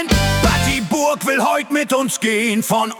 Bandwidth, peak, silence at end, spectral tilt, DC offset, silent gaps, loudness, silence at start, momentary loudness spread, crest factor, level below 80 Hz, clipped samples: 18 kHz; -4 dBFS; 0 s; -4 dB/octave; under 0.1%; none; -17 LUFS; 0 s; 3 LU; 14 dB; -30 dBFS; under 0.1%